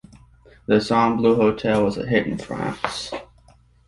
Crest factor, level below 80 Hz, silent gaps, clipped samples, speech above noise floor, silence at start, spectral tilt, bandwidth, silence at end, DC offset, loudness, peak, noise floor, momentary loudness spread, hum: 20 dB; -50 dBFS; none; under 0.1%; 34 dB; 0.7 s; -6 dB/octave; 11.5 kHz; 0.65 s; under 0.1%; -21 LUFS; -2 dBFS; -54 dBFS; 13 LU; none